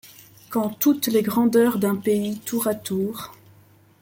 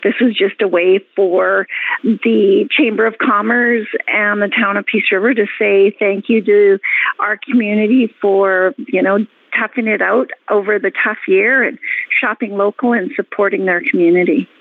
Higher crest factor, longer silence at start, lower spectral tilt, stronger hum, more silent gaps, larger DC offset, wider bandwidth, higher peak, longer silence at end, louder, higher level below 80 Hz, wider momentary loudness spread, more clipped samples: first, 16 dB vs 10 dB; about the same, 0.05 s vs 0 s; second, -5 dB/octave vs -8 dB/octave; neither; neither; neither; first, 17 kHz vs 4.1 kHz; about the same, -6 dBFS vs -4 dBFS; first, 0.7 s vs 0.15 s; second, -22 LUFS vs -14 LUFS; first, -64 dBFS vs -70 dBFS; first, 10 LU vs 5 LU; neither